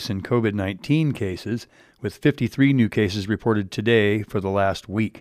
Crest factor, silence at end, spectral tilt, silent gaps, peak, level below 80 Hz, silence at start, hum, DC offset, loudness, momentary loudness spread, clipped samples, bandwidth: 16 dB; 0 s; -7 dB/octave; none; -6 dBFS; -54 dBFS; 0 s; none; under 0.1%; -22 LUFS; 10 LU; under 0.1%; 15 kHz